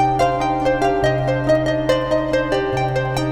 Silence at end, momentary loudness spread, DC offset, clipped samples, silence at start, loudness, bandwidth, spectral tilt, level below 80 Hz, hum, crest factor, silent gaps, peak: 0 s; 3 LU; under 0.1%; under 0.1%; 0 s; -18 LUFS; 13 kHz; -6.5 dB/octave; -36 dBFS; none; 12 dB; none; -6 dBFS